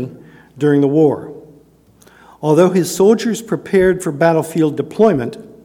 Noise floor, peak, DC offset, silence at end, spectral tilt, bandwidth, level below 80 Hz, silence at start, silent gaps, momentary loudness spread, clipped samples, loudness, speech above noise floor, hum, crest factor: -48 dBFS; 0 dBFS; under 0.1%; 0.2 s; -6.5 dB/octave; 18 kHz; -50 dBFS; 0 s; none; 11 LU; under 0.1%; -15 LUFS; 35 dB; none; 16 dB